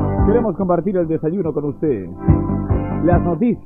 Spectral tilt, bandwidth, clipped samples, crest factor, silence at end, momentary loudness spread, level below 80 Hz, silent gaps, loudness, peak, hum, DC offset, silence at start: -13 dB/octave; 3.7 kHz; under 0.1%; 16 dB; 0 s; 5 LU; -28 dBFS; none; -18 LUFS; -2 dBFS; none; under 0.1%; 0 s